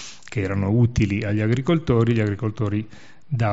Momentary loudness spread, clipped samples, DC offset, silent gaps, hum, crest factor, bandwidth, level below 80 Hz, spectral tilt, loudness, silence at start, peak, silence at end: 10 LU; under 0.1%; 0.8%; none; none; 16 dB; 8 kHz; -42 dBFS; -7.5 dB/octave; -22 LUFS; 0 s; -6 dBFS; 0 s